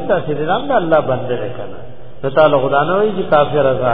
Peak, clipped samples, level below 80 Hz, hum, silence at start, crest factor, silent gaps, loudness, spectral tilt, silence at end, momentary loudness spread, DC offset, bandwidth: 0 dBFS; under 0.1%; -44 dBFS; none; 0 s; 16 dB; none; -15 LUFS; -10 dB/octave; 0 s; 14 LU; 5%; 4.9 kHz